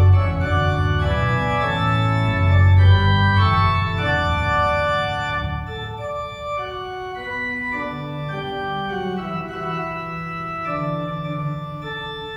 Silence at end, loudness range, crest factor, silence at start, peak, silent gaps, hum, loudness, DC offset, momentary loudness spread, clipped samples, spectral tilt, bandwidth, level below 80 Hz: 0 s; 9 LU; 16 dB; 0 s; -4 dBFS; none; none; -21 LUFS; under 0.1%; 12 LU; under 0.1%; -7 dB/octave; 7.4 kHz; -34 dBFS